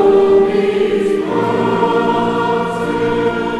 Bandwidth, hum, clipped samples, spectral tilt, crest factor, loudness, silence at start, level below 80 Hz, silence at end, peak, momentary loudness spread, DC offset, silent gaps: 11 kHz; none; under 0.1%; -6.5 dB/octave; 12 dB; -15 LUFS; 0 s; -46 dBFS; 0 s; -2 dBFS; 6 LU; under 0.1%; none